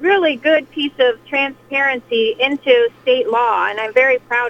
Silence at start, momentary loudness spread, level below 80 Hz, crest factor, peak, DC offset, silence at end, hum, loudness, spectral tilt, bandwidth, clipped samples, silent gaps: 0 s; 5 LU; -62 dBFS; 16 dB; 0 dBFS; under 0.1%; 0 s; none; -16 LUFS; -4 dB/octave; 7.4 kHz; under 0.1%; none